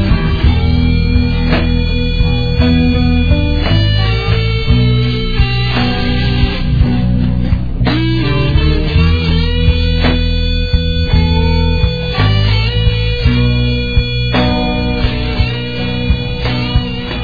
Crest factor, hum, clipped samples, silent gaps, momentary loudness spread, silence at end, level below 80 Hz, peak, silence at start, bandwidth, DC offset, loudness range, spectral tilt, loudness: 12 dB; none; under 0.1%; none; 4 LU; 0 s; -16 dBFS; 0 dBFS; 0 s; 5 kHz; under 0.1%; 1 LU; -8 dB/octave; -13 LUFS